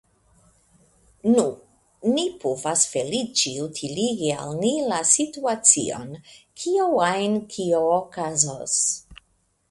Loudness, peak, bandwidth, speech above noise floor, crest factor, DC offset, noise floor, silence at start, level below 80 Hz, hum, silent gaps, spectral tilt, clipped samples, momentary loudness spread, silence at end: -22 LUFS; 0 dBFS; 11.5 kHz; 44 dB; 24 dB; under 0.1%; -67 dBFS; 1.25 s; -62 dBFS; none; none; -3 dB/octave; under 0.1%; 10 LU; 0.55 s